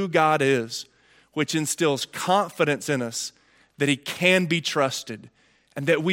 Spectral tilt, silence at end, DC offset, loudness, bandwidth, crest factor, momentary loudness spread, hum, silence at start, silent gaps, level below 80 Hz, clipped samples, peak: -4 dB/octave; 0 s; under 0.1%; -23 LUFS; 17 kHz; 20 dB; 15 LU; none; 0 s; none; -72 dBFS; under 0.1%; -4 dBFS